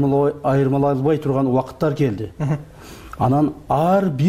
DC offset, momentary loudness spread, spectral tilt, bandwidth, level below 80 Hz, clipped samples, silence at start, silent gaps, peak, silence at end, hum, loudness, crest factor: 0.1%; 9 LU; -9 dB/octave; 15 kHz; -46 dBFS; under 0.1%; 0 s; none; -8 dBFS; 0 s; none; -19 LUFS; 12 dB